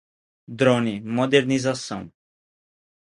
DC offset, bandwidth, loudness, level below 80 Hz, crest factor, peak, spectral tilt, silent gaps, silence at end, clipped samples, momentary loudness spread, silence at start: under 0.1%; 11.5 kHz; -22 LUFS; -62 dBFS; 22 dB; -2 dBFS; -5.5 dB/octave; none; 1.05 s; under 0.1%; 14 LU; 0.5 s